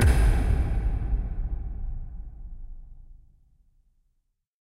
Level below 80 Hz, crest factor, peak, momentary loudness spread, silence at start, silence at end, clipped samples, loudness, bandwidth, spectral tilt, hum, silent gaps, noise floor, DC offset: -28 dBFS; 18 dB; -10 dBFS; 23 LU; 0 s; 1.5 s; under 0.1%; -28 LUFS; 12.5 kHz; -6.5 dB/octave; none; none; -74 dBFS; under 0.1%